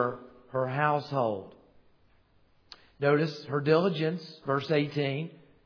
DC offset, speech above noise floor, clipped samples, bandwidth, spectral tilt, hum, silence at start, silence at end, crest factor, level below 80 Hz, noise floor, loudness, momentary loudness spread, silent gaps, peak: under 0.1%; 36 dB; under 0.1%; 5.4 kHz; -7.5 dB/octave; none; 0 s; 0.3 s; 20 dB; -70 dBFS; -64 dBFS; -29 LUFS; 11 LU; none; -10 dBFS